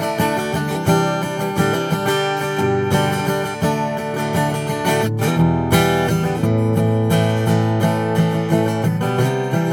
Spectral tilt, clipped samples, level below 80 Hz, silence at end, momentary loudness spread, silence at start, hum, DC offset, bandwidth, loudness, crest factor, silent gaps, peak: -6 dB/octave; under 0.1%; -44 dBFS; 0 s; 4 LU; 0 s; none; under 0.1%; 19.5 kHz; -18 LUFS; 16 dB; none; -2 dBFS